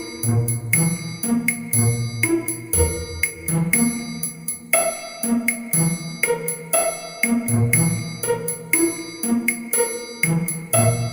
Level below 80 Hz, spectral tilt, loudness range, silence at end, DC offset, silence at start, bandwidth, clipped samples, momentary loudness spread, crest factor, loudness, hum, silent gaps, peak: -42 dBFS; -4.5 dB/octave; 1 LU; 0 s; under 0.1%; 0 s; 16.5 kHz; under 0.1%; 6 LU; 20 dB; -20 LUFS; none; none; 0 dBFS